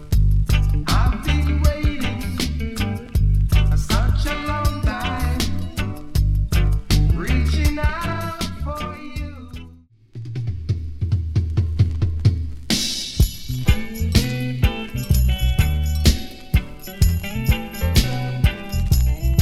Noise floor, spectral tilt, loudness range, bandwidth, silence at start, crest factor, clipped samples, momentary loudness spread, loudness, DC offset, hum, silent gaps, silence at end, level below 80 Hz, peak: -46 dBFS; -5.5 dB/octave; 4 LU; 15.5 kHz; 0 s; 18 dB; under 0.1%; 9 LU; -21 LUFS; under 0.1%; none; none; 0 s; -22 dBFS; -2 dBFS